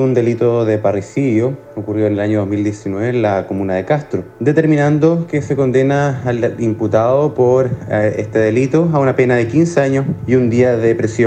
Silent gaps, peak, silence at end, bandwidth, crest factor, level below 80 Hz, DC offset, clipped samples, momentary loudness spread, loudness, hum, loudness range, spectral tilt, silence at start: none; 0 dBFS; 0 s; 9 kHz; 14 dB; -48 dBFS; under 0.1%; under 0.1%; 6 LU; -15 LUFS; none; 3 LU; -8 dB/octave; 0 s